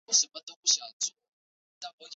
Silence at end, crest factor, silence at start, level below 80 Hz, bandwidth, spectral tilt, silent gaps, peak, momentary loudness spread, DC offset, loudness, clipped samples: 0 s; 22 dB; 0.1 s; -80 dBFS; 8.4 kHz; 3.5 dB/octave; 0.43-0.47 s, 0.56-0.63 s, 0.93-1.00 s, 1.28-1.81 s, 1.93-1.98 s; -12 dBFS; 19 LU; under 0.1%; -28 LUFS; under 0.1%